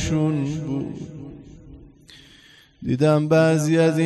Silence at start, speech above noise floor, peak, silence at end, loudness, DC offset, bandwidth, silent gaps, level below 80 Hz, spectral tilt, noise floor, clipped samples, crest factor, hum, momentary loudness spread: 0 s; 32 dB; -6 dBFS; 0 s; -20 LUFS; under 0.1%; 12 kHz; none; -48 dBFS; -6.5 dB/octave; -51 dBFS; under 0.1%; 16 dB; none; 19 LU